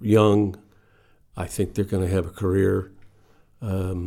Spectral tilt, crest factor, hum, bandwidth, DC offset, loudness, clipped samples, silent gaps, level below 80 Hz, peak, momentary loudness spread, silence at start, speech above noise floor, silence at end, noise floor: -7.5 dB/octave; 18 dB; none; 16 kHz; under 0.1%; -23 LUFS; under 0.1%; none; -48 dBFS; -6 dBFS; 19 LU; 0 s; 36 dB; 0 s; -57 dBFS